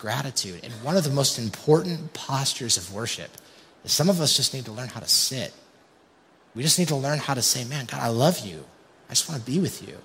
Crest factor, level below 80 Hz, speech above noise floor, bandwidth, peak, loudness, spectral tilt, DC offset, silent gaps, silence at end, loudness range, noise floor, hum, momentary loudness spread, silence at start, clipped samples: 20 dB; -64 dBFS; 32 dB; 16 kHz; -6 dBFS; -24 LUFS; -3.5 dB/octave; under 0.1%; none; 0 s; 2 LU; -58 dBFS; none; 14 LU; 0 s; under 0.1%